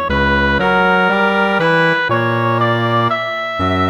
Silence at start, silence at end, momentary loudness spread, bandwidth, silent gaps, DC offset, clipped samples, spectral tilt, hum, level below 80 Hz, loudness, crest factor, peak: 0 s; 0 s; 4 LU; 18.5 kHz; none; under 0.1%; under 0.1%; -6.5 dB/octave; none; -32 dBFS; -14 LUFS; 12 dB; -2 dBFS